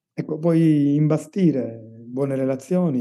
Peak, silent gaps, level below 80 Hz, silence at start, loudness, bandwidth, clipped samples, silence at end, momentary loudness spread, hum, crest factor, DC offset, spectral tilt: -8 dBFS; none; -84 dBFS; 0.15 s; -21 LUFS; 12 kHz; under 0.1%; 0 s; 13 LU; none; 14 dB; under 0.1%; -9 dB/octave